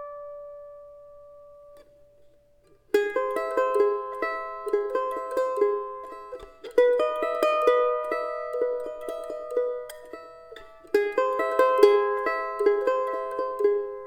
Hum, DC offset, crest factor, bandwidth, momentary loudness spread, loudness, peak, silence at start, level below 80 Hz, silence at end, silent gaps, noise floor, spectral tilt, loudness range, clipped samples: none; under 0.1%; 24 dB; 16.5 kHz; 20 LU; -25 LUFS; -2 dBFS; 0 s; -64 dBFS; 0 s; none; -59 dBFS; -3.5 dB/octave; 6 LU; under 0.1%